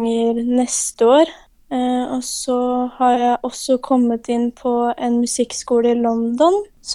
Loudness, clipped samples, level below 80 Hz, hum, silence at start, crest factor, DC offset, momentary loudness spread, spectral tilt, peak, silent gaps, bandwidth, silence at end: -18 LUFS; under 0.1%; -54 dBFS; none; 0 s; 16 dB; under 0.1%; 6 LU; -3.5 dB/octave; -2 dBFS; none; 13 kHz; 0 s